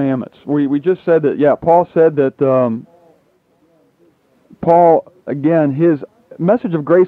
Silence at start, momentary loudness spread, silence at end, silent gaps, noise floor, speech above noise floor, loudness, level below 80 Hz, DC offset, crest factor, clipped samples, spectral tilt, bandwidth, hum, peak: 0 s; 10 LU; 0 s; none; -57 dBFS; 43 dB; -14 LUFS; -56 dBFS; under 0.1%; 14 dB; under 0.1%; -10.5 dB/octave; 4.3 kHz; none; 0 dBFS